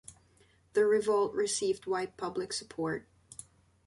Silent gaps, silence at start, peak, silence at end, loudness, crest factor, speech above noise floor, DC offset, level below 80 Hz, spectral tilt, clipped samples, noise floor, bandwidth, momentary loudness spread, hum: none; 0.1 s; -18 dBFS; 0.85 s; -32 LUFS; 16 dB; 35 dB; under 0.1%; -70 dBFS; -3.5 dB/octave; under 0.1%; -65 dBFS; 11.5 kHz; 22 LU; none